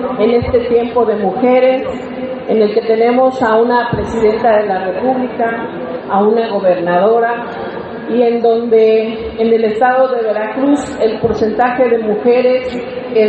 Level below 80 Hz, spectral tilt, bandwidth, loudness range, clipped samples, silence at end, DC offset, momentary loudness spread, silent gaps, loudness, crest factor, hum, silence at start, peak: -42 dBFS; -7 dB/octave; 8.2 kHz; 2 LU; under 0.1%; 0 s; under 0.1%; 10 LU; none; -13 LUFS; 12 dB; none; 0 s; 0 dBFS